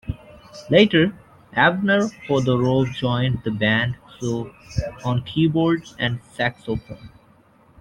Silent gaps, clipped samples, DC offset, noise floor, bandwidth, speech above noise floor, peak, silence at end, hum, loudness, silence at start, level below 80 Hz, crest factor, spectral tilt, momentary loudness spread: none; under 0.1%; under 0.1%; -54 dBFS; 10.5 kHz; 34 dB; -2 dBFS; 0.75 s; none; -21 LUFS; 0.05 s; -46 dBFS; 20 dB; -6.5 dB/octave; 13 LU